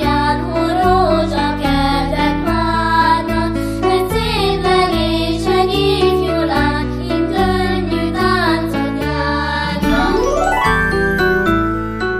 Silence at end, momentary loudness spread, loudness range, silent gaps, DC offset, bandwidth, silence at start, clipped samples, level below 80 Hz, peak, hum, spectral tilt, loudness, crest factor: 0 s; 4 LU; 1 LU; none; under 0.1%; 15.5 kHz; 0 s; under 0.1%; -26 dBFS; -2 dBFS; none; -6 dB/octave; -15 LUFS; 14 dB